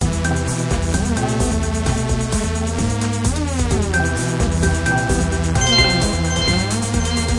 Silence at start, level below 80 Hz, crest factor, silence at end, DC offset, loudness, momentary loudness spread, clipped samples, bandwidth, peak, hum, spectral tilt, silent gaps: 0 s; -26 dBFS; 18 dB; 0 s; under 0.1%; -18 LUFS; 5 LU; under 0.1%; 11.5 kHz; 0 dBFS; none; -4.5 dB/octave; none